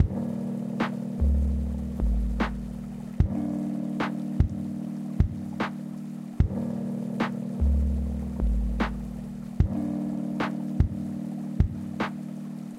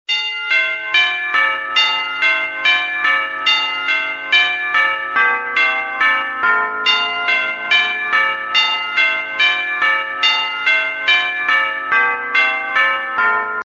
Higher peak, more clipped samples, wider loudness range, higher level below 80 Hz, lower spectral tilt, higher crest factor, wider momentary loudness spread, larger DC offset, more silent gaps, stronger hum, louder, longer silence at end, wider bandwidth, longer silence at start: second, -8 dBFS vs 0 dBFS; neither; about the same, 1 LU vs 0 LU; first, -32 dBFS vs -64 dBFS; first, -8 dB/octave vs 4.5 dB/octave; about the same, 18 dB vs 16 dB; first, 9 LU vs 2 LU; neither; neither; neither; second, -30 LUFS vs -15 LUFS; about the same, 0 s vs 0.05 s; first, 11.5 kHz vs 7.8 kHz; about the same, 0 s vs 0.1 s